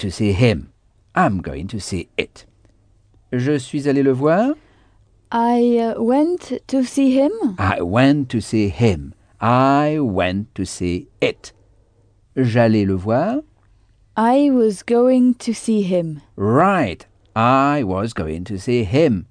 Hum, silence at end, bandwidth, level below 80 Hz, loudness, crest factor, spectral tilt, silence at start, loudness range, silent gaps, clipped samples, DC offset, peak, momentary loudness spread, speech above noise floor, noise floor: none; 0.05 s; 10 kHz; -46 dBFS; -18 LUFS; 18 dB; -7 dB/octave; 0 s; 4 LU; none; under 0.1%; under 0.1%; -2 dBFS; 11 LU; 38 dB; -55 dBFS